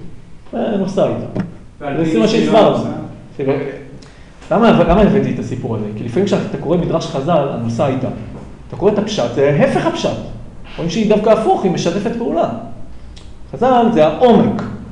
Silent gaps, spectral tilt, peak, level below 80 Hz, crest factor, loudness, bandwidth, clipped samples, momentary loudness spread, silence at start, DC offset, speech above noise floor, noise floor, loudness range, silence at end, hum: none; -7 dB/octave; 0 dBFS; -36 dBFS; 14 dB; -15 LUFS; 10.5 kHz; under 0.1%; 17 LU; 0 s; under 0.1%; 22 dB; -37 dBFS; 3 LU; 0 s; none